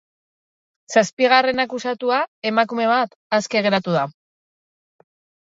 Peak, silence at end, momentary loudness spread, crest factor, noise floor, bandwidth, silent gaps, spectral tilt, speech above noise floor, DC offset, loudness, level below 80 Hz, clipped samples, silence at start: 0 dBFS; 1.35 s; 7 LU; 20 dB; under -90 dBFS; 7.8 kHz; 1.13-1.17 s, 2.28-2.42 s, 3.16-3.30 s; -4 dB/octave; over 71 dB; under 0.1%; -19 LUFS; -66 dBFS; under 0.1%; 0.9 s